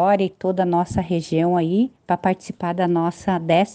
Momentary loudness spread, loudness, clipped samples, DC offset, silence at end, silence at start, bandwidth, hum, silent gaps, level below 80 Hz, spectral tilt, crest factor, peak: 5 LU; -21 LUFS; under 0.1%; under 0.1%; 0 s; 0 s; 9.2 kHz; none; none; -50 dBFS; -7 dB/octave; 16 dB; -4 dBFS